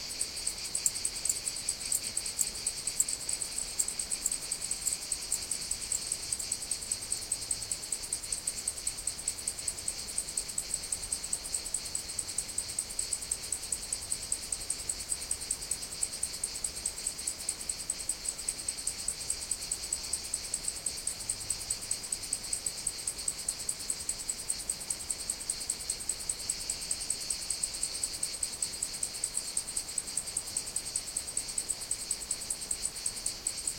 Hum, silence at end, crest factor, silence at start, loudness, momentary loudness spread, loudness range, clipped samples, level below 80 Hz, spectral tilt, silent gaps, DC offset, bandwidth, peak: none; 0 s; 26 dB; 0 s; -33 LUFS; 3 LU; 2 LU; under 0.1%; -56 dBFS; 0.5 dB/octave; none; under 0.1%; 17 kHz; -10 dBFS